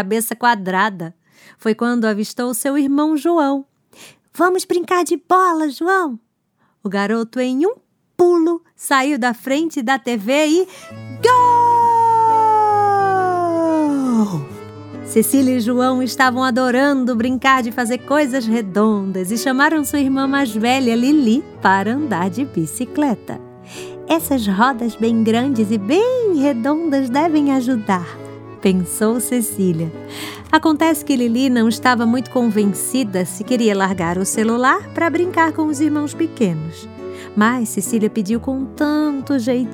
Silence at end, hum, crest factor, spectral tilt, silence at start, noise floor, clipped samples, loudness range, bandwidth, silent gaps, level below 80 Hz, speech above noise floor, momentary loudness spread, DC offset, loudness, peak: 0 s; none; 16 dB; -5 dB/octave; 0 s; -63 dBFS; under 0.1%; 4 LU; 19 kHz; none; -58 dBFS; 47 dB; 10 LU; under 0.1%; -17 LUFS; 0 dBFS